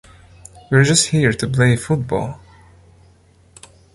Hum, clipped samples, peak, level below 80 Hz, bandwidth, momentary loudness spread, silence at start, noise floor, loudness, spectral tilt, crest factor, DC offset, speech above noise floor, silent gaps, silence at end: none; under 0.1%; -2 dBFS; -44 dBFS; 11.5 kHz; 11 LU; 0.7 s; -51 dBFS; -16 LUFS; -4.5 dB/octave; 18 dB; under 0.1%; 35 dB; none; 1.55 s